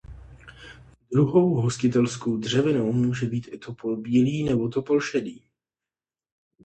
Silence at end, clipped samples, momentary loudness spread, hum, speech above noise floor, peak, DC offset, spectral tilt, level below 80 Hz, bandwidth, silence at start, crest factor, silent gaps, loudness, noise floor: 1.25 s; under 0.1%; 11 LU; none; over 67 dB; -6 dBFS; under 0.1%; -6.5 dB/octave; -54 dBFS; 9 kHz; 0.1 s; 18 dB; none; -24 LUFS; under -90 dBFS